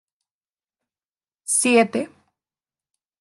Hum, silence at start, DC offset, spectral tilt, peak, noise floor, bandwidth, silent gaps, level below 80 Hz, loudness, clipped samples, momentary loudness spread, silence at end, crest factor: none; 1.5 s; under 0.1%; -2.5 dB/octave; -6 dBFS; under -90 dBFS; 12.5 kHz; none; -80 dBFS; -19 LUFS; under 0.1%; 19 LU; 1.15 s; 20 dB